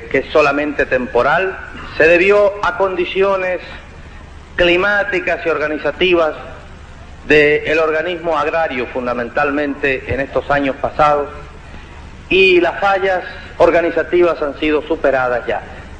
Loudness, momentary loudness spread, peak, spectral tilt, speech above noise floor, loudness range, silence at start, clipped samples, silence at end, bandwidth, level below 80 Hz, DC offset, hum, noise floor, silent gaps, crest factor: -15 LUFS; 13 LU; 0 dBFS; -5.5 dB/octave; 20 dB; 3 LU; 0 s; under 0.1%; 0 s; 8.8 kHz; -38 dBFS; under 0.1%; none; -35 dBFS; none; 16 dB